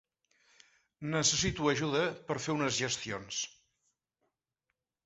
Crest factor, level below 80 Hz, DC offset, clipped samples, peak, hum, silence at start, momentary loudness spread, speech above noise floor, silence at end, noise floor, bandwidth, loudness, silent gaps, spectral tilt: 20 dB; -60 dBFS; under 0.1%; under 0.1%; -14 dBFS; none; 1 s; 9 LU; 54 dB; 1.55 s; -86 dBFS; 8.2 kHz; -32 LUFS; none; -3 dB/octave